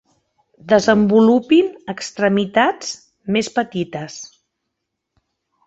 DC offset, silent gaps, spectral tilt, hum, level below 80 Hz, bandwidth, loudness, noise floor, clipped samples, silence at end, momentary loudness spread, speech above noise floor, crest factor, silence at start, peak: under 0.1%; none; -5 dB/octave; none; -58 dBFS; 8.2 kHz; -17 LUFS; -77 dBFS; under 0.1%; 1.4 s; 17 LU; 61 dB; 18 dB; 0.65 s; -2 dBFS